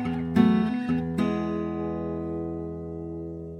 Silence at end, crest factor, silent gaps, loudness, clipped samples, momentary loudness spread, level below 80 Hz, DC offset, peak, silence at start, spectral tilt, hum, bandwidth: 0 s; 20 dB; none; -27 LUFS; under 0.1%; 14 LU; -48 dBFS; under 0.1%; -8 dBFS; 0 s; -8.5 dB/octave; none; 9.6 kHz